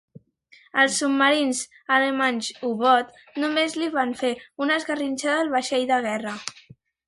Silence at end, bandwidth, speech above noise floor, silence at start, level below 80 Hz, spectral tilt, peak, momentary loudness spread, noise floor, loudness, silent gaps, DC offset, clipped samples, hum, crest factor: 0.55 s; 11.5 kHz; 33 dB; 0.15 s; -70 dBFS; -2 dB/octave; -4 dBFS; 9 LU; -56 dBFS; -23 LUFS; none; under 0.1%; under 0.1%; none; 18 dB